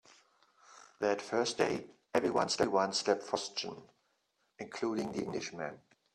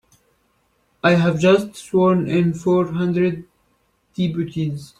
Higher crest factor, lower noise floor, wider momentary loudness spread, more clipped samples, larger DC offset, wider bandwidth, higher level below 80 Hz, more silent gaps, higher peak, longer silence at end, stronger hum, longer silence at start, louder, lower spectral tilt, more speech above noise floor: first, 22 dB vs 16 dB; first, -78 dBFS vs -64 dBFS; first, 13 LU vs 9 LU; neither; neither; first, 13 kHz vs 11.5 kHz; second, -72 dBFS vs -56 dBFS; neither; second, -14 dBFS vs -4 dBFS; first, 0.35 s vs 0.15 s; neither; second, 0.7 s vs 1.05 s; second, -34 LUFS vs -19 LUFS; second, -3.5 dB/octave vs -7 dB/octave; about the same, 44 dB vs 46 dB